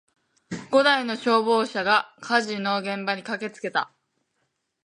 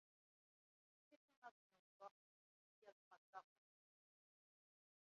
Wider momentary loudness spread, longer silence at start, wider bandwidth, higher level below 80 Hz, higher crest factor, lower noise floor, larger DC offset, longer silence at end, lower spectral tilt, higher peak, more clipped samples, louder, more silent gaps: first, 11 LU vs 3 LU; second, 0.5 s vs 1.1 s; first, 11 kHz vs 6.6 kHz; first, -72 dBFS vs under -90 dBFS; second, 18 dB vs 28 dB; second, -75 dBFS vs under -90 dBFS; neither; second, 1 s vs 1.7 s; first, -4 dB/octave vs -0.5 dB/octave; first, -6 dBFS vs -42 dBFS; neither; first, -23 LUFS vs -65 LUFS; second, none vs 1.16-1.28 s, 1.37-1.42 s, 1.51-1.70 s, 1.79-2.00 s, 2.11-2.82 s, 2.92-3.11 s, 3.17-3.33 s